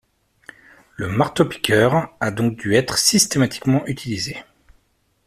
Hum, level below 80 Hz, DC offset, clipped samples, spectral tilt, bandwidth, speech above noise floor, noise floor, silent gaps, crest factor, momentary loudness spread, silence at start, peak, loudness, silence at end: none; -52 dBFS; under 0.1%; under 0.1%; -4 dB/octave; 15 kHz; 46 dB; -65 dBFS; none; 20 dB; 11 LU; 1 s; 0 dBFS; -19 LUFS; 0.85 s